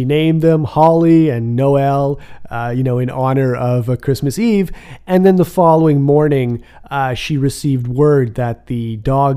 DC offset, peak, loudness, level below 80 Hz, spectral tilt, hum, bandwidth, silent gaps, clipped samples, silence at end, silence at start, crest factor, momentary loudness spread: under 0.1%; 0 dBFS; -14 LUFS; -38 dBFS; -8 dB/octave; none; 15.5 kHz; none; under 0.1%; 0 s; 0 s; 14 dB; 10 LU